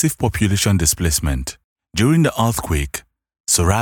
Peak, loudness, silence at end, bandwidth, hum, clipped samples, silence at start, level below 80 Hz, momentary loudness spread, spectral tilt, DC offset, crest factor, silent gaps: -4 dBFS; -18 LUFS; 0 s; 18 kHz; none; under 0.1%; 0 s; -32 dBFS; 12 LU; -4.5 dB/octave; under 0.1%; 16 dB; 1.64-1.76 s, 3.40-3.44 s